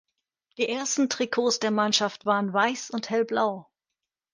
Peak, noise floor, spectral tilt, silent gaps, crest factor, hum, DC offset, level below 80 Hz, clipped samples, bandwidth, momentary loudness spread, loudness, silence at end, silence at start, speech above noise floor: -6 dBFS; -87 dBFS; -3 dB/octave; none; 22 dB; none; under 0.1%; -74 dBFS; under 0.1%; 10.5 kHz; 6 LU; -25 LUFS; 0.7 s; 0.6 s; 61 dB